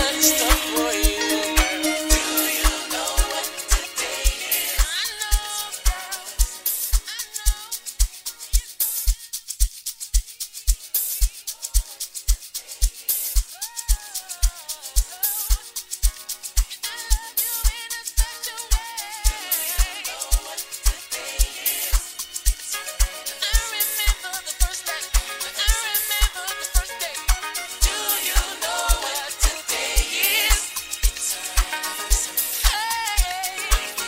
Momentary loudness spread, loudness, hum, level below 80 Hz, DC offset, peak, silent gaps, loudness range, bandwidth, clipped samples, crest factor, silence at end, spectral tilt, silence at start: 8 LU; -23 LUFS; none; -26 dBFS; under 0.1%; -2 dBFS; none; 4 LU; 16.5 kHz; under 0.1%; 22 dB; 0 s; -2 dB/octave; 0 s